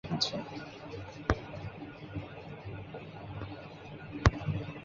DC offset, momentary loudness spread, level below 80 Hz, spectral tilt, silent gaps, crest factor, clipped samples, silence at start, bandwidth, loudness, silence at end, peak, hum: under 0.1%; 15 LU; -44 dBFS; -4.5 dB/octave; none; 34 dB; under 0.1%; 0.05 s; 7.2 kHz; -37 LUFS; 0 s; -2 dBFS; none